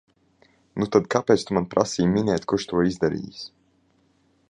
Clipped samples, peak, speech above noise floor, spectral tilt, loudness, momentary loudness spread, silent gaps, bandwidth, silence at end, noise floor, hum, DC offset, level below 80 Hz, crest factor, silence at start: under 0.1%; -2 dBFS; 41 dB; -6 dB/octave; -23 LUFS; 16 LU; none; 10.5 kHz; 1 s; -64 dBFS; none; under 0.1%; -52 dBFS; 22 dB; 0.75 s